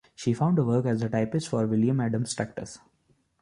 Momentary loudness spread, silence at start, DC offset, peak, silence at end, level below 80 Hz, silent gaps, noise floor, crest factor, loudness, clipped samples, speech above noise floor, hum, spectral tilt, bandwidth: 9 LU; 0.2 s; under 0.1%; -12 dBFS; 0.65 s; -60 dBFS; none; -68 dBFS; 14 dB; -27 LUFS; under 0.1%; 42 dB; none; -7 dB/octave; 11 kHz